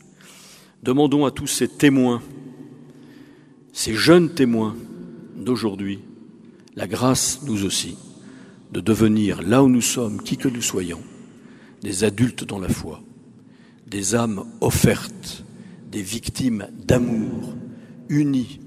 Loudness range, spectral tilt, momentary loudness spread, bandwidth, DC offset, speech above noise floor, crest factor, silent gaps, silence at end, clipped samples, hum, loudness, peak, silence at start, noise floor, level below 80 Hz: 5 LU; -5 dB/octave; 21 LU; 15.5 kHz; under 0.1%; 28 dB; 22 dB; none; 0 s; under 0.1%; none; -21 LUFS; 0 dBFS; 0.85 s; -48 dBFS; -46 dBFS